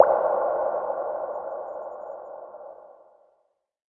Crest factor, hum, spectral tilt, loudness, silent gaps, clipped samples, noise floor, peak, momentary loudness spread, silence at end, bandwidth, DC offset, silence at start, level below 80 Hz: 26 dB; none; -8.5 dB/octave; -27 LUFS; none; under 0.1%; -71 dBFS; 0 dBFS; 19 LU; 1 s; 2.8 kHz; under 0.1%; 0 s; -70 dBFS